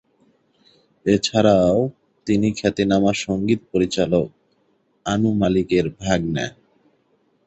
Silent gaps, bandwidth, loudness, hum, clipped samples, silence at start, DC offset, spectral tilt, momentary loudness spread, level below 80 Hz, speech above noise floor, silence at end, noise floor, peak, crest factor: none; 8.2 kHz; -20 LUFS; none; under 0.1%; 1.05 s; under 0.1%; -6 dB/octave; 11 LU; -46 dBFS; 45 dB; 0.95 s; -64 dBFS; -2 dBFS; 18 dB